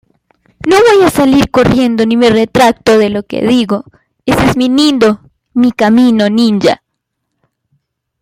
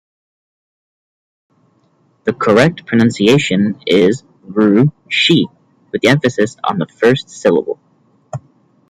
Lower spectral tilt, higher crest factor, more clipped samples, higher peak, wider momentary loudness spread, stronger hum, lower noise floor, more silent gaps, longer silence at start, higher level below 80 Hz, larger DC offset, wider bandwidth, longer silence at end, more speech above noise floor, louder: about the same, -5.5 dB/octave vs -5.5 dB/octave; about the same, 10 dB vs 14 dB; neither; about the same, 0 dBFS vs 0 dBFS; second, 8 LU vs 14 LU; neither; first, -71 dBFS vs -56 dBFS; neither; second, 0.65 s vs 2.25 s; first, -38 dBFS vs -54 dBFS; neither; first, 16 kHz vs 13 kHz; first, 1.45 s vs 0.5 s; first, 62 dB vs 44 dB; first, -10 LUFS vs -14 LUFS